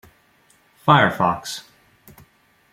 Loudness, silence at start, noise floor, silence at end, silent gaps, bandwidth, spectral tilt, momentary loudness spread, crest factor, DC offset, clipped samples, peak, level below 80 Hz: -19 LUFS; 0.85 s; -58 dBFS; 1.15 s; none; 16 kHz; -5 dB/octave; 17 LU; 22 dB; under 0.1%; under 0.1%; -2 dBFS; -58 dBFS